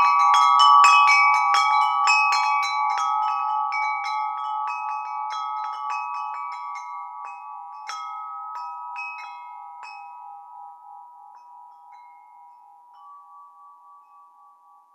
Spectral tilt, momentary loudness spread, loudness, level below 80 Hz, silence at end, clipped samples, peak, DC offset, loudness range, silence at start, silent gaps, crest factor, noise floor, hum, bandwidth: 6 dB/octave; 25 LU; -20 LUFS; under -90 dBFS; 1.5 s; under 0.1%; -2 dBFS; under 0.1%; 24 LU; 0 s; none; 20 dB; -54 dBFS; none; 13 kHz